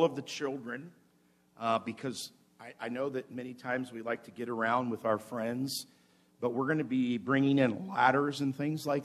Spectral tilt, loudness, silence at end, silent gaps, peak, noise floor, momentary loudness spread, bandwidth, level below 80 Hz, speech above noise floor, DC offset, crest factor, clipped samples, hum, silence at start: -5.5 dB/octave; -33 LUFS; 0 s; none; -10 dBFS; -68 dBFS; 15 LU; 14.5 kHz; -80 dBFS; 36 dB; under 0.1%; 24 dB; under 0.1%; none; 0 s